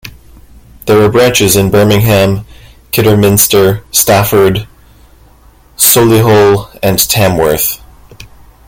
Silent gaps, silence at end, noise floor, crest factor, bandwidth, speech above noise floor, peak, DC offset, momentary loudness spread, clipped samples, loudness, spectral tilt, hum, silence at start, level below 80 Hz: none; 0.45 s; -41 dBFS; 10 dB; over 20 kHz; 34 dB; 0 dBFS; under 0.1%; 7 LU; 0.3%; -8 LUFS; -4.5 dB/octave; none; 0.05 s; -34 dBFS